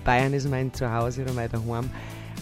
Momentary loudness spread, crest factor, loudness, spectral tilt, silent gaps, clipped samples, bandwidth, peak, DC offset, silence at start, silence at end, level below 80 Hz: 12 LU; 18 dB; -27 LUFS; -6.5 dB/octave; none; under 0.1%; 15.5 kHz; -8 dBFS; under 0.1%; 0 s; 0 s; -40 dBFS